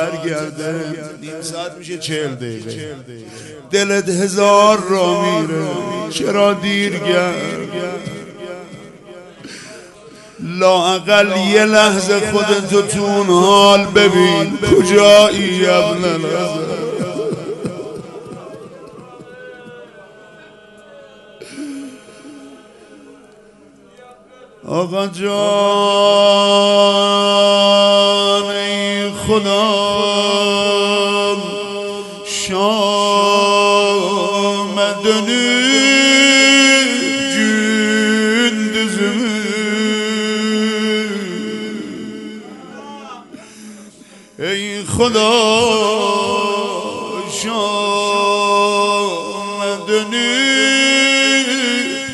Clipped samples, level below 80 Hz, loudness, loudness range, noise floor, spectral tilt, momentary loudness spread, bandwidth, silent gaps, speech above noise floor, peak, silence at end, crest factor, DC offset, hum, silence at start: under 0.1%; -52 dBFS; -14 LUFS; 14 LU; -45 dBFS; -3 dB/octave; 19 LU; 12 kHz; none; 31 dB; 0 dBFS; 0 s; 16 dB; under 0.1%; none; 0 s